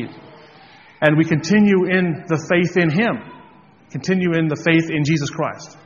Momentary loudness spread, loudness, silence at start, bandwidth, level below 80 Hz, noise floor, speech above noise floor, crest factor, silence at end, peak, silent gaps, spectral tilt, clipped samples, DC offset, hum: 11 LU; -18 LUFS; 0 s; 7.2 kHz; -56 dBFS; -47 dBFS; 29 dB; 18 dB; 0.15 s; 0 dBFS; none; -5.5 dB/octave; under 0.1%; under 0.1%; none